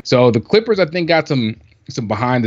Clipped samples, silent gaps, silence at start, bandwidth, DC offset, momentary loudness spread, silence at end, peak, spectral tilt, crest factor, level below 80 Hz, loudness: under 0.1%; none; 0.05 s; 7.8 kHz; under 0.1%; 13 LU; 0 s; 0 dBFS; -6.5 dB/octave; 16 dB; -54 dBFS; -16 LUFS